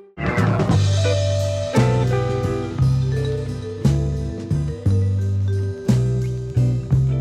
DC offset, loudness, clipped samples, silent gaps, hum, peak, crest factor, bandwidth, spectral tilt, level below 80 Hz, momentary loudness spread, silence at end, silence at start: under 0.1%; -20 LUFS; under 0.1%; none; none; -4 dBFS; 16 dB; 11 kHz; -7 dB/octave; -34 dBFS; 6 LU; 0 s; 0.15 s